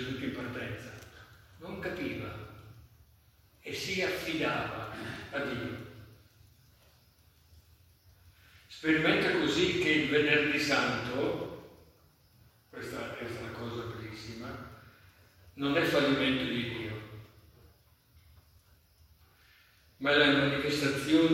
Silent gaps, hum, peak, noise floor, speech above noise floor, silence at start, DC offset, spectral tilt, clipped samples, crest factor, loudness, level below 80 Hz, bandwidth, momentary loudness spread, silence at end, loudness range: none; none; -12 dBFS; -63 dBFS; 34 dB; 0 s; under 0.1%; -5 dB/octave; under 0.1%; 22 dB; -31 LUFS; -62 dBFS; 16.5 kHz; 21 LU; 0 s; 14 LU